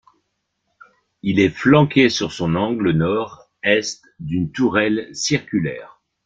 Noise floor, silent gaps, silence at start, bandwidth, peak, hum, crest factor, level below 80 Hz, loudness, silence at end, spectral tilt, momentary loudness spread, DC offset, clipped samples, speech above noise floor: -73 dBFS; none; 1.25 s; 9 kHz; -2 dBFS; none; 18 dB; -52 dBFS; -19 LUFS; 0.4 s; -5.5 dB/octave; 13 LU; under 0.1%; under 0.1%; 55 dB